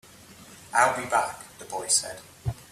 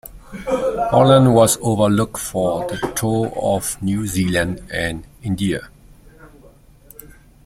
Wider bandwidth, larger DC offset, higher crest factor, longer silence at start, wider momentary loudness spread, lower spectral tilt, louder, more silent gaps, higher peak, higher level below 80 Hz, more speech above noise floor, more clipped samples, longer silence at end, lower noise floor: about the same, 15.5 kHz vs 16.5 kHz; neither; about the same, 22 dB vs 18 dB; first, 0.3 s vs 0.05 s; first, 16 LU vs 13 LU; second, -2 dB/octave vs -5.5 dB/octave; second, -26 LUFS vs -18 LUFS; neither; second, -8 dBFS vs -2 dBFS; second, -54 dBFS vs -42 dBFS; second, 23 dB vs 29 dB; neither; second, 0.05 s vs 1.2 s; about the same, -49 dBFS vs -47 dBFS